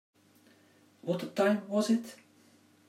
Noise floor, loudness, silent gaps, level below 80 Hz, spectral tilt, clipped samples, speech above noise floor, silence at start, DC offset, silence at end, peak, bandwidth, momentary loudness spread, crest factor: -63 dBFS; -31 LUFS; none; -86 dBFS; -5.5 dB/octave; under 0.1%; 33 dB; 1.05 s; under 0.1%; 0.75 s; -16 dBFS; 15 kHz; 13 LU; 18 dB